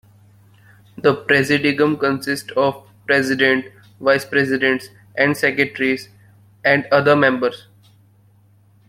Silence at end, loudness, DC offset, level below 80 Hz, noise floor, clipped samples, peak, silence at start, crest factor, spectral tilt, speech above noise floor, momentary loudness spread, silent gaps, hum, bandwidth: 1.35 s; -17 LUFS; under 0.1%; -60 dBFS; -53 dBFS; under 0.1%; -2 dBFS; 1.05 s; 18 dB; -5 dB/octave; 36 dB; 8 LU; none; none; 16 kHz